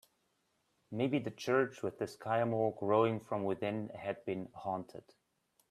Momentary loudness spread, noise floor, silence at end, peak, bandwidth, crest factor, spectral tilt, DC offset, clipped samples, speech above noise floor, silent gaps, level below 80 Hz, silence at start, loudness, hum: 10 LU; -79 dBFS; 0.7 s; -16 dBFS; 14 kHz; 20 dB; -7 dB/octave; under 0.1%; under 0.1%; 43 dB; none; -78 dBFS; 0.9 s; -36 LUFS; none